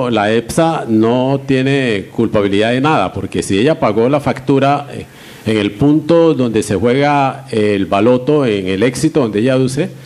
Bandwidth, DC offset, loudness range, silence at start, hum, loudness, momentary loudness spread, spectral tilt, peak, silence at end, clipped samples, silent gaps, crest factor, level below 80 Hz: 14 kHz; under 0.1%; 2 LU; 0 s; none; -13 LUFS; 5 LU; -6 dB/octave; 0 dBFS; 0 s; under 0.1%; none; 12 dB; -44 dBFS